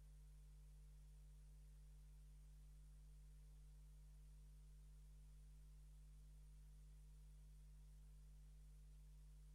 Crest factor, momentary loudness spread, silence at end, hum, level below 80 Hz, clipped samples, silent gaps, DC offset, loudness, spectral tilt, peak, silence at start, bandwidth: 6 dB; 0 LU; 0 s; 50 Hz at -65 dBFS; -64 dBFS; under 0.1%; none; under 0.1%; -67 LUFS; -5.5 dB/octave; -56 dBFS; 0 s; 12.5 kHz